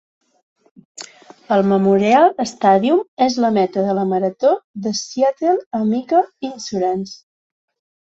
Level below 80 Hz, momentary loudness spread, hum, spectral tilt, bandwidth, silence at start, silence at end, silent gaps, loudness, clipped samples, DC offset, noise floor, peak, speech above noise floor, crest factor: -62 dBFS; 12 LU; none; -5.5 dB/octave; 8 kHz; 1 s; 0.85 s; 3.08-3.17 s, 4.64-4.74 s, 5.66-5.71 s; -17 LUFS; under 0.1%; under 0.1%; -40 dBFS; -2 dBFS; 23 dB; 16 dB